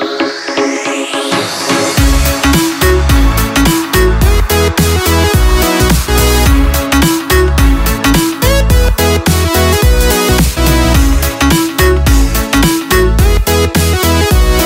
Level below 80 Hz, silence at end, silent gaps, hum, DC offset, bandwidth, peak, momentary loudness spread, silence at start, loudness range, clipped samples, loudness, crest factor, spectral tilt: -12 dBFS; 0 s; none; none; under 0.1%; 16.5 kHz; 0 dBFS; 3 LU; 0 s; 1 LU; under 0.1%; -10 LUFS; 10 dB; -4.5 dB/octave